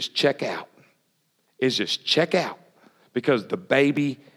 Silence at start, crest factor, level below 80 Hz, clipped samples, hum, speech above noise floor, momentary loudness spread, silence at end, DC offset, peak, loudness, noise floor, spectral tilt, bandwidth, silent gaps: 0 s; 22 dB; -82 dBFS; under 0.1%; none; 46 dB; 10 LU; 0.2 s; under 0.1%; -4 dBFS; -23 LUFS; -70 dBFS; -4.5 dB/octave; 15 kHz; none